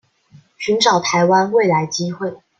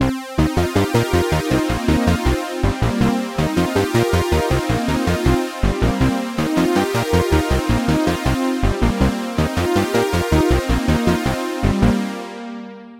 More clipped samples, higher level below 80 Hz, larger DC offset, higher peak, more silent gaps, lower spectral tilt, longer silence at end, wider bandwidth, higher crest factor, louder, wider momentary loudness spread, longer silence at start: neither; second, -64 dBFS vs -26 dBFS; second, under 0.1% vs 0.7%; about the same, -2 dBFS vs -2 dBFS; neither; second, -4 dB/octave vs -6 dB/octave; first, 0.25 s vs 0 s; second, 9.2 kHz vs 16 kHz; about the same, 16 dB vs 16 dB; about the same, -16 LUFS vs -18 LUFS; first, 10 LU vs 4 LU; first, 0.6 s vs 0 s